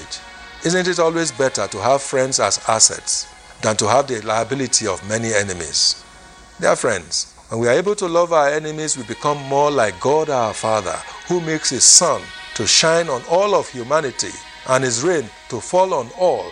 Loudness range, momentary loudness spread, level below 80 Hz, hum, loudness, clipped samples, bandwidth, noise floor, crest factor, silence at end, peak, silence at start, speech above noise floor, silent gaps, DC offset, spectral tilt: 4 LU; 11 LU; -52 dBFS; none; -17 LUFS; under 0.1%; 16 kHz; -43 dBFS; 18 dB; 0 s; 0 dBFS; 0 s; 25 dB; none; under 0.1%; -2 dB/octave